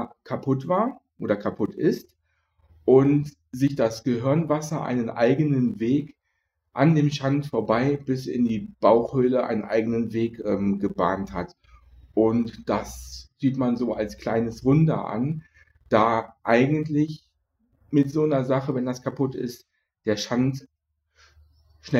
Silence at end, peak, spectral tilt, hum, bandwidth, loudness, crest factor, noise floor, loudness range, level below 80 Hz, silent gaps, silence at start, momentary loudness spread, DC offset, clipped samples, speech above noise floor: 0 s; -2 dBFS; -7.5 dB/octave; none; 15 kHz; -24 LUFS; 22 dB; -76 dBFS; 4 LU; -54 dBFS; none; 0 s; 11 LU; under 0.1%; under 0.1%; 53 dB